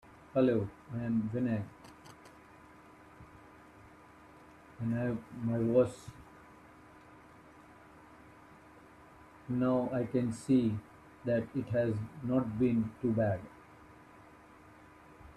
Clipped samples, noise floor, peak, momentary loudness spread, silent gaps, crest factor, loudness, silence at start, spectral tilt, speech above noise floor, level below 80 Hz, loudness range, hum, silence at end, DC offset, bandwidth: under 0.1%; -57 dBFS; -16 dBFS; 26 LU; none; 20 dB; -33 LUFS; 0.35 s; -8.5 dB/octave; 25 dB; -64 dBFS; 10 LU; none; 0.05 s; under 0.1%; 11.5 kHz